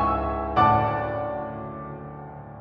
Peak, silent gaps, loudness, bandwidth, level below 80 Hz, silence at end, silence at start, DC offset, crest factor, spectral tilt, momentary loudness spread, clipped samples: -6 dBFS; none; -24 LUFS; 5.8 kHz; -40 dBFS; 0 s; 0 s; under 0.1%; 20 dB; -9 dB/octave; 19 LU; under 0.1%